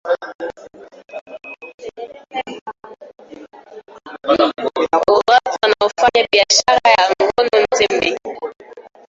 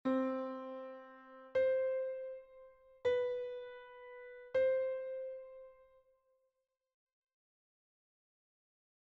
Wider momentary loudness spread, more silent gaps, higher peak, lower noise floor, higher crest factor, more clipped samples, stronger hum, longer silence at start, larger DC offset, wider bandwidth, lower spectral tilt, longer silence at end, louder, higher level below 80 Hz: about the same, 22 LU vs 20 LU; first, 0.35-0.39 s, 1.21-1.26 s, 1.74-1.78 s, 2.61-2.66 s vs none; first, 0 dBFS vs -24 dBFS; second, -39 dBFS vs -85 dBFS; about the same, 18 dB vs 16 dB; neither; neither; about the same, 0.05 s vs 0.05 s; neither; first, 8.2 kHz vs 6 kHz; second, -1.5 dB/octave vs -3.5 dB/octave; second, 0.3 s vs 3.35 s; first, -15 LUFS vs -38 LUFS; first, -54 dBFS vs -78 dBFS